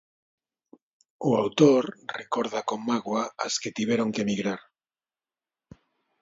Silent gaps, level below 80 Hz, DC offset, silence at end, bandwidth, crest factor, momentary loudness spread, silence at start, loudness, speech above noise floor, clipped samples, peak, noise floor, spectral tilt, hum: none; -70 dBFS; under 0.1%; 1.65 s; 7.8 kHz; 22 dB; 12 LU; 1.2 s; -26 LUFS; over 65 dB; under 0.1%; -6 dBFS; under -90 dBFS; -5 dB/octave; none